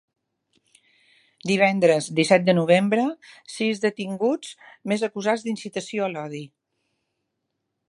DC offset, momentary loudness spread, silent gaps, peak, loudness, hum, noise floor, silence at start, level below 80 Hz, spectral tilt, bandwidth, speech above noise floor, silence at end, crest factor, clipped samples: under 0.1%; 17 LU; none; -4 dBFS; -22 LUFS; none; -79 dBFS; 1.45 s; -74 dBFS; -5.5 dB/octave; 11.5 kHz; 56 dB; 1.45 s; 22 dB; under 0.1%